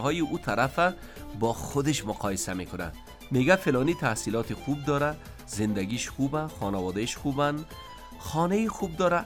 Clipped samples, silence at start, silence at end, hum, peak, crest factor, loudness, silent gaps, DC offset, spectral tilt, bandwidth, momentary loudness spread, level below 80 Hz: under 0.1%; 0 s; 0 s; none; -8 dBFS; 20 dB; -28 LUFS; none; under 0.1%; -5 dB/octave; 19 kHz; 13 LU; -48 dBFS